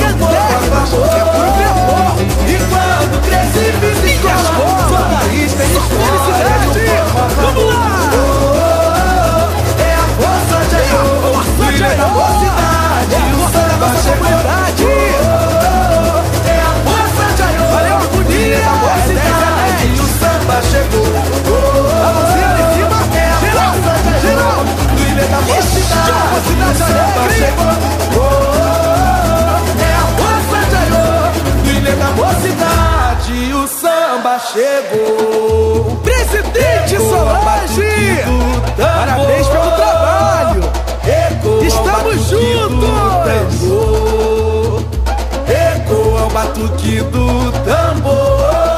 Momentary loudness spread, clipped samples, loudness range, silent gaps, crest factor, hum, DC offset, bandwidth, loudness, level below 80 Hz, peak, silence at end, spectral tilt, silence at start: 3 LU; under 0.1%; 2 LU; none; 10 dB; none; under 0.1%; 15.5 kHz; -12 LUFS; -18 dBFS; 0 dBFS; 0 s; -5 dB/octave; 0 s